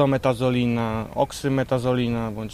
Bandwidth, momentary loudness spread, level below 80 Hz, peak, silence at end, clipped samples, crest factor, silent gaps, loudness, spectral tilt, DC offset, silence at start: 15 kHz; 4 LU; -46 dBFS; -6 dBFS; 0 s; under 0.1%; 16 dB; none; -23 LUFS; -7 dB/octave; under 0.1%; 0 s